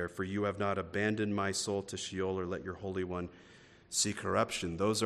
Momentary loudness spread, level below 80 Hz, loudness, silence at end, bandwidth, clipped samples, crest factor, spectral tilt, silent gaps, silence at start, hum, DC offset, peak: 7 LU; -66 dBFS; -35 LUFS; 0 s; 14 kHz; under 0.1%; 18 dB; -4 dB/octave; none; 0 s; none; under 0.1%; -16 dBFS